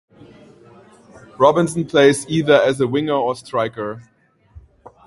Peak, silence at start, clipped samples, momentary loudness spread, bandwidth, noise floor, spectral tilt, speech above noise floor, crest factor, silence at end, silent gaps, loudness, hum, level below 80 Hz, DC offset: 0 dBFS; 1.15 s; under 0.1%; 11 LU; 11.5 kHz; -46 dBFS; -5.5 dB/octave; 30 dB; 18 dB; 0.45 s; none; -17 LUFS; none; -54 dBFS; under 0.1%